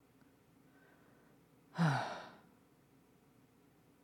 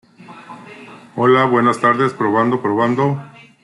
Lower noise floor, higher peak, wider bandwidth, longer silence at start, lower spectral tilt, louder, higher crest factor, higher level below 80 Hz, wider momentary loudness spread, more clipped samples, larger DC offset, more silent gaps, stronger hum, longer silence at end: first, -68 dBFS vs -38 dBFS; second, -22 dBFS vs -2 dBFS; first, 13 kHz vs 11.5 kHz; first, 1.75 s vs 0.2 s; about the same, -6.5 dB/octave vs -7 dB/octave; second, -38 LUFS vs -16 LUFS; first, 22 dB vs 14 dB; second, -84 dBFS vs -64 dBFS; about the same, 22 LU vs 23 LU; neither; neither; neither; neither; first, 1.65 s vs 0.35 s